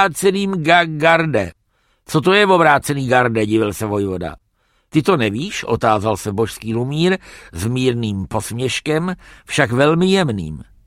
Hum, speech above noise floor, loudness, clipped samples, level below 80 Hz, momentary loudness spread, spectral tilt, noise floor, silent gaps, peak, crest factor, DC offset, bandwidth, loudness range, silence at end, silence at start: none; 46 dB; -17 LUFS; under 0.1%; -46 dBFS; 10 LU; -5.5 dB/octave; -62 dBFS; none; 0 dBFS; 18 dB; under 0.1%; 16 kHz; 5 LU; 0.25 s; 0 s